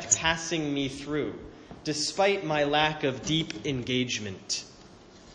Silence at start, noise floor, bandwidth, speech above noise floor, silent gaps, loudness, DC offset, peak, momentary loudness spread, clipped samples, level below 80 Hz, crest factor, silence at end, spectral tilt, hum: 0 s; -51 dBFS; 10 kHz; 23 dB; none; -28 LUFS; under 0.1%; -6 dBFS; 10 LU; under 0.1%; -54 dBFS; 24 dB; 0 s; -3 dB/octave; none